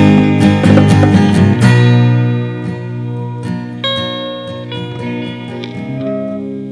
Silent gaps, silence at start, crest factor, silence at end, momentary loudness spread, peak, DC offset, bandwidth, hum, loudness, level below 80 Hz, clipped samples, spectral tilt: none; 0 s; 12 dB; 0 s; 15 LU; 0 dBFS; under 0.1%; 11 kHz; 60 Hz at -20 dBFS; -13 LUFS; -42 dBFS; 0.6%; -7.5 dB/octave